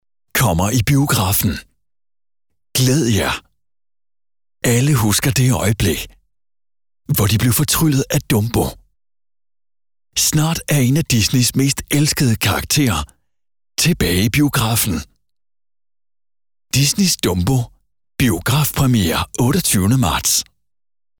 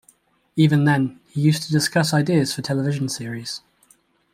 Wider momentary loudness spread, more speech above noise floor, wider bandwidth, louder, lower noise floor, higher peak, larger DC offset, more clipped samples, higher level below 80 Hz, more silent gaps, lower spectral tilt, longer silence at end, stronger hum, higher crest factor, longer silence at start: second, 7 LU vs 12 LU; first, over 74 dB vs 39 dB; first, over 20 kHz vs 15.5 kHz; first, -16 LUFS vs -21 LUFS; first, under -90 dBFS vs -59 dBFS; about the same, -6 dBFS vs -4 dBFS; neither; neither; first, -36 dBFS vs -60 dBFS; neither; second, -4 dB/octave vs -5.5 dB/octave; about the same, 0.75 s vs 0.75 s; neither; second, 12 dB vs 18 dB; second, 0.35 s vs 0.55 s